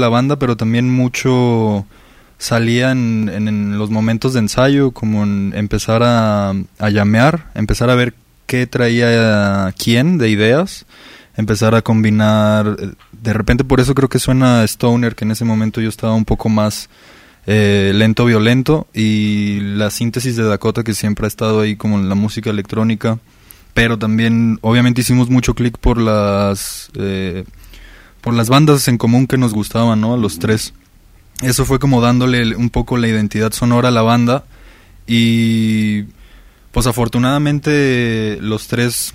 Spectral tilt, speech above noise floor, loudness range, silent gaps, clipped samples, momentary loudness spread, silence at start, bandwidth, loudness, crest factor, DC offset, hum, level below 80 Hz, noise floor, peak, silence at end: -6 dB/octave; 32 dB; 3 LU; none; under 0.1%; 8 LU; 0 s; 16 kHz; -14 LUFS; 14 dB; under 0.1%; none; -32 dBFS; -45 dBFS; 0 dBFS; 0.05 s